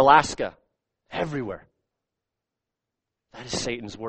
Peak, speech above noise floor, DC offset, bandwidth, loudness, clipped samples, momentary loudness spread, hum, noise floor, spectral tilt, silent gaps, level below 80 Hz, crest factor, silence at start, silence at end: -2 dBFS; 63 dB; under 0.1%; 8.8 kHz; -26 LUFS; under 0.1%; 19 LU; none; -86 dBFS; -4 dB/octave; none; -54 dBFS; 24 dB; 0 s; 0 s